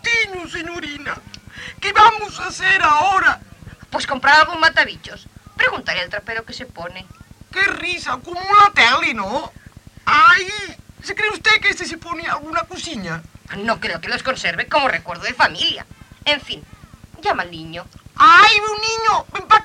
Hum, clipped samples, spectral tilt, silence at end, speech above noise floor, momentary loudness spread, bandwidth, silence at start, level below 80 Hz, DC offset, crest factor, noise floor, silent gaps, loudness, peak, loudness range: none; under 0.1%; -2 dB/octave; 0 s; 25 dB; 20 LU; 13.5 kHz; 0.05 s; -48 dBFS; under 0.1%; 18 dB; -42 dBFS; none; -16 LUFS; 0 dBFS; 7 LU